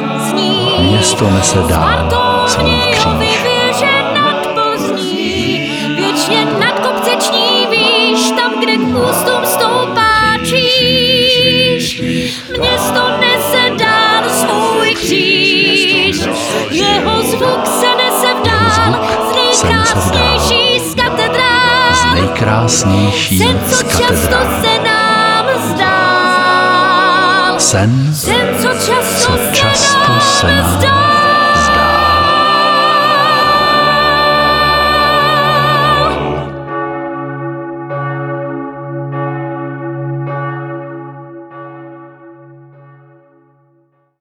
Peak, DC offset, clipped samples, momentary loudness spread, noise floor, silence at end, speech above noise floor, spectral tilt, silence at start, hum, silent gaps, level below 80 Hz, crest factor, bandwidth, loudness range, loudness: 0 dBFS; under 0.1%; under 0.1%; 11 LU; -55 dBFS; 1.65 s; 44 dB; -3.5 dB/octave; 0 s; none; none; -32 dBFS; 12 dB; over 20 kHz; 11 LU; -10 LUFS